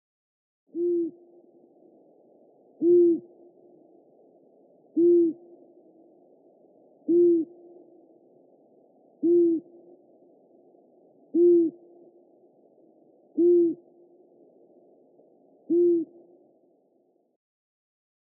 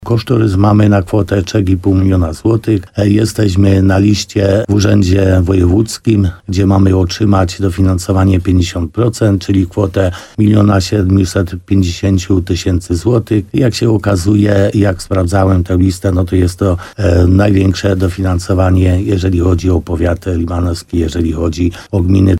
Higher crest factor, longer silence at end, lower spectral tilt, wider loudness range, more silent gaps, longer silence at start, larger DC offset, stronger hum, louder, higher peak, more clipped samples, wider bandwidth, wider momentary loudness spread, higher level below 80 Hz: first, 16 dB vs 10 dB; first, 2.3 s vs 0 s; first, -15.5 dB/octave vs -7 dB/octave; first, 5 LU vs 2 LU; neither; first, 0.75 s vs 0 s; neither; neither; second, -23 LUFS vs -12 LUFS; second, -12 dBFS vs 0 dBFS; neither; second, 0.8 kHz vs 12.5 kHz; first, 16 LU vs 6 LU; second, under -90 dBFS vs -28 dBFS